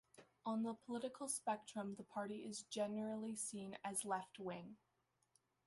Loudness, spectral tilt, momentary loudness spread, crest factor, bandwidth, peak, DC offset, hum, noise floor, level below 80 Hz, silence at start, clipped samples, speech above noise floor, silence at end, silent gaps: -46 LUFS; -4 dB/octave; 7 LU; 18 dB; 11.5 kHz; -28 dBFS; under 0.1%; none; -81 dBFS; -88 dBFS; 0.15 s; under 0.1%; 35 dB; 0.9 s; none